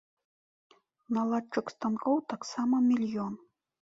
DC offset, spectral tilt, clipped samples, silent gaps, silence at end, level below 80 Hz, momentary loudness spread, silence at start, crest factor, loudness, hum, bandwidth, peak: under 0.1%; -6 dB/octave; under 0.1%; none; 0.6 s; -76 dBFS; 10 LU; 1.1 s; 16 dB; -31 LUFS; none; 7.8 kHz; -16 dBFS